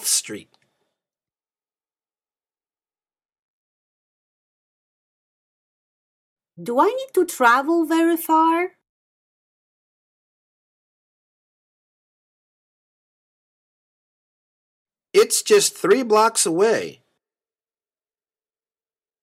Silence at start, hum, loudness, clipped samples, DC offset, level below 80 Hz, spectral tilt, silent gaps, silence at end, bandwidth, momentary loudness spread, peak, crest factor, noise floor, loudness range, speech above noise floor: 0 s; none; -18 LUFS; under 0.1%; under 0.1%; -74 dBFS; -2 dB/octave; 3.39-6.36 s, 8.89-14.85 s; 2.3 s; 16 kHz; 10 LU; -2 dBFS; 22 dB; under -90 dBFS; 9 LU; over 72 dB